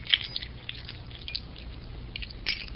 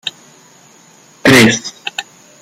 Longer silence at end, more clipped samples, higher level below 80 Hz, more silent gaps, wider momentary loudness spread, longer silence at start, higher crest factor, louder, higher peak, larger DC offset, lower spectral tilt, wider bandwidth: second, 0 s vs 0.4 s; neither; about the same, -44 dBFS vs -48 dBFS; neither; about the same, 17 LU vs 18 LU; about the same, 0 s vs 0.05 s; first, 32 dB vs 16 dB; second, -34 LUFS vs -11 LUFS; about the same, -2 dBFS vs 0 dBFS; neither; second, -0.5 dB/octave vs -3.5 dB/octave; second, 6 kHz vs 16.5 kHz